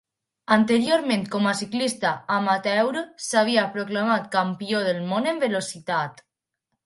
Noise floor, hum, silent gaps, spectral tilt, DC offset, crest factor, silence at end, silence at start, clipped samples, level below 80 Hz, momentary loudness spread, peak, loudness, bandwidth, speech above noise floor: -80 dBFS; none; none; -4.5 dB/octave; under 0.1%; 20 dB; 0.75 s; 0.5 s; under 0.1%; -70 dBFS; 7 LU; -4 dBFS; -23 LUFS; 11.5 kHz; 57 dB